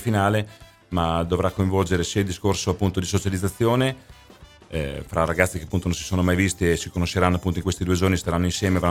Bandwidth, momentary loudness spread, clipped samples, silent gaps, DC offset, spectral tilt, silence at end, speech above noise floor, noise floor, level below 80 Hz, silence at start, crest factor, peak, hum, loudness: 16 kHz; 6 LU; under 0.1%; none; under 0.1%; -5.5 dB/octave; 0 s; 26 dB; -48 dBFS; -40 dBFS; 0 s; 22 dB; 0 dBFS; none; -23 LUFS